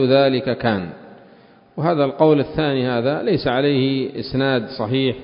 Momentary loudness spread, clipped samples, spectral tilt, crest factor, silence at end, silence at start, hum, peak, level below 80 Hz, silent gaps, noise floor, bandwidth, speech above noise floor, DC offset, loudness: 8 LU; under 0.1%; -11.5 dB/octave; 16 dB; 0 s; 0 s; none; -2 dBFS; -50 dBFS; none; -49 dBFS; 5.4 kHz; 30 dB; under 0.1%; -19 LUFS